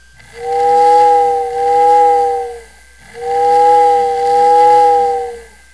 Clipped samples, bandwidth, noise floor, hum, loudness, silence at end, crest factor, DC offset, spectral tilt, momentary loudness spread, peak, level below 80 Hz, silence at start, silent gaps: under 0.1%; 11 kHz; -41 dBFS; none; -11 LUFS; 0.3 s; 12 dB; 0.4%; -3.5 dB/octave; 12 LU; 0 dBFS; -48 dBFS; 0.35 s; none